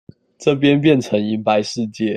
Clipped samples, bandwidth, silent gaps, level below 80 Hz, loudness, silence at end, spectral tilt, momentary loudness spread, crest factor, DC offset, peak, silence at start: under 0.1%; 9.6 kHz; none; -60 dBFS; -17 LUFS; 0 s; -6 dB/octave; 8 LU; 16 dB; under 0.1%; -2 dBFS; 0.4 s